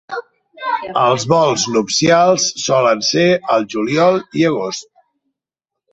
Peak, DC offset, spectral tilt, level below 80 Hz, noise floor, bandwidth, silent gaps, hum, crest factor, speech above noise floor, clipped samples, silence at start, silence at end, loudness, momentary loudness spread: -2 dBFS; under 0.1%; -4 dB/octave; -56 dBFS; -83 dBFS; 8.4 kHz; none; none; 14 dB; 68 dB; under 0.1%; 0.1 s; 1.1 s; -15 LUFS; 11 LU